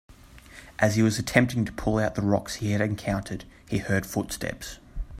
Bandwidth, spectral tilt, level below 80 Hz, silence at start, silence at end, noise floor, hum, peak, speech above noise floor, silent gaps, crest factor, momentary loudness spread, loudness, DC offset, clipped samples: 16 kHz; -5.5 dB/octave; -44 dBFS; 0.1 s; 0 s; -48 dBFS; none; -4 dBFS; 22 dB; none; 24 dB; 17 LU; -26 LUFS; under 0.1%; under 0.1%